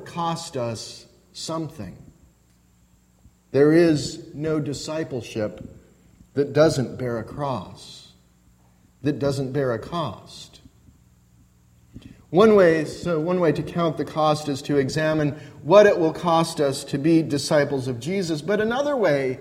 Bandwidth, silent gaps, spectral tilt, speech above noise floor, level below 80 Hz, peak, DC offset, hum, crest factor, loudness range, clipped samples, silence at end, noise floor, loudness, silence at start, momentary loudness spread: 15.5 kHz; none; -6 dB/octave; 37 dB; -54 dBFS; -2 dBFS; under 0.1%; none; 22 dB; 9 LU; under 0.1%; 0 s; -59 dBFS; -22 LUFS; 0 s; 18 LU